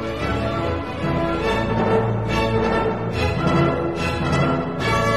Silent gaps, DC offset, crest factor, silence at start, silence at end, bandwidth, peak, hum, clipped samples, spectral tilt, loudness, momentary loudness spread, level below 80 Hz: none; 0.6%; 16 dB; 0 s; 0 s; 13 kHz; -6 dBFS; none; under 0.1%; -6.5 dB/octave; -21 LUFS; 4 LU; -34 dBFS